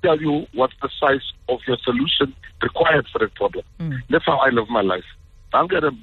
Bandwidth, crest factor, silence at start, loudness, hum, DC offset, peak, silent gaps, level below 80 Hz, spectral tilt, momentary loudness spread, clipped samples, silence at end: 4.4 kHz; 16 dB; 0.05 s; -20 LUFS; none; under 0.1%; -4 dBFS; none; -46 dBFS; -7.5 dB/octave; 9 LU; under 0.1%; 0 s